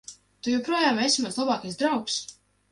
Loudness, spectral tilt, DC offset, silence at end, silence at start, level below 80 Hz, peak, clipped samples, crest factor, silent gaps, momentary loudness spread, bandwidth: -25 LUFS; -2.5 dB/octave; under 0.1%; 0.4 s; 0.1 s; -68 dBFS; -10 dBFS; under 0.1%; 18 dB; none; 11 LU; 11.5 kHz